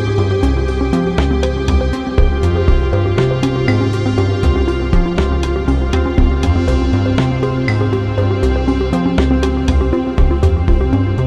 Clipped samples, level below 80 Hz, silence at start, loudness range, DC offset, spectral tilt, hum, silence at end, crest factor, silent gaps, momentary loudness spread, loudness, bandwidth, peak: under 0.1%; -18 dBFS; 0 s; 0 LU; under 0.1%; -7.5 dB/octave; none; 0 s; 12 dB; none; 2 LU; -15 LUFS; 9.2 kHz; 0 dBFS